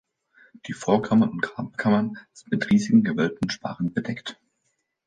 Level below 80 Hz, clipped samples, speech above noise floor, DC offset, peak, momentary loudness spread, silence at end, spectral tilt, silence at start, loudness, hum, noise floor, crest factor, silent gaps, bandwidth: -60 dBFS; under 0.1%; 51 dB; under 0.1%; -4 dBFS; 15 LU; 0.75 s; -6.5 dB/octave; 0.65 s; -24 LUFS; none; -74 dBFS; 20 dB; none; 9.2 kHz